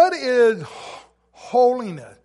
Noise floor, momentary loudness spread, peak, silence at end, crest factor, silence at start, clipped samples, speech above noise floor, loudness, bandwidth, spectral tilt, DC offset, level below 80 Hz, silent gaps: -46 dBFS; 19 LU; -4 dBFS; 0.15 s; 16 dB; 0 s; under 0.1%; 27 dB; -19 LUFS; 11.5 kHz; -5 dB/octave; under 0.1%; -66 dBFS; none